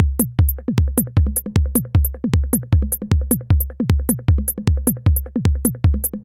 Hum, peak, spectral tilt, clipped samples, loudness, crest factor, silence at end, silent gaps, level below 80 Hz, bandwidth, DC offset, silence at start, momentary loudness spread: none; 0 dBFS; -6 dB/octave; under 0.1%; -19 LUFS; 16 dB; 0 s; none; -22 dBFS; 16.5 kHz; under 0.1%; 0 s; 2 LU